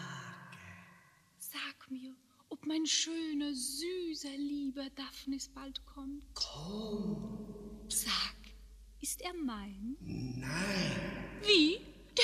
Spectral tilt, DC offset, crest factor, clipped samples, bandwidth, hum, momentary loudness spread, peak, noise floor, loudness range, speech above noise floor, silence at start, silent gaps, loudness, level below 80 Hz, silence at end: -3 dB/octave; under 0.1%; 26 dB; under 0.1%; 15 kHz; none; 17 LU; -12 dBFS; -64 dBFS; 7 LU; 27 dB; 0 s; none; -36 LUFS; -58 dBFS; 0 s